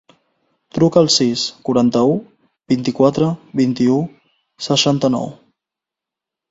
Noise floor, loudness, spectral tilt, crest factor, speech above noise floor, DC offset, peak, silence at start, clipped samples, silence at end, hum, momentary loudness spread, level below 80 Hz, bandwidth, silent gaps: -85 dBFS; -16 LUFS; -5 dB/octave; 18 dB; 70 dB; under 0.1%; 0 dBFS; 0.75 s; under 0.1%; 1.2 s; none; 10 LU; -56 dBFS; 7.8 kHz; none